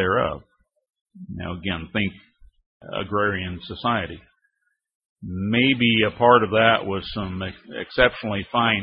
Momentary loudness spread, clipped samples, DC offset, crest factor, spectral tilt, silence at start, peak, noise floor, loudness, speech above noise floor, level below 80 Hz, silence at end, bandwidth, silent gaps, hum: 17 LU; under 0.1%; under 0.1%; 22 dB; -10 dB/octave; 0 s; -2 dBFS; -74 dBFS; -22 LUFS; 52 dB; -48 dBFS; 0 s; 5.4 kHz; 1.01-1.06 s, 2.66-2.80 s, 4.95-5.00 s, 5.09-5.16 s; none